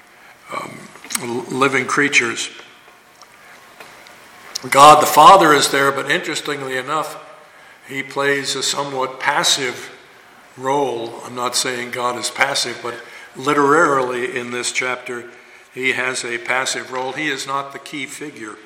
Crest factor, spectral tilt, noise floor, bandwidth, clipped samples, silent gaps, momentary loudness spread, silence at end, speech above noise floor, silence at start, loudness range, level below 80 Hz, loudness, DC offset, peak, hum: 18 dB; -2.5 dB/octave; -46 dBFS; 17 kHz; under 0.1%; none; 20 LU; 0.05 s; 29 dB; 0.45 s; 9 LU; -60 dBFS; -16 LUFS; under 0.1%; 0 dBFS; none